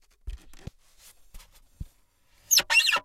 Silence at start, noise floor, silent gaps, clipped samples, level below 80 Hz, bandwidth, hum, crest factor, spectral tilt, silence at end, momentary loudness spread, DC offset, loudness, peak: 0.25 s; -63 dBFS; none; under 0.1%; -48 dBFS; 16.5 kHz; none; 22 dB; 1 dB/octave; 0.05 s; 28 LU; under 0.1%; -20 LUFS; -8 dBFS